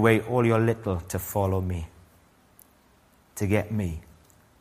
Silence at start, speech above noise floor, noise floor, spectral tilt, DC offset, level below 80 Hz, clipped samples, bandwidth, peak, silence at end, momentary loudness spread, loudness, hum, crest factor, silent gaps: 0 s; 35 dB; -60 dBFS; -6.5 dB/octave; under 0.1%; -48 dBFS; under 0.1%; 15.5 kHz; -4 dBFS; 0.6 s; 15 LU; -26 LUFS; none; 22 dB; none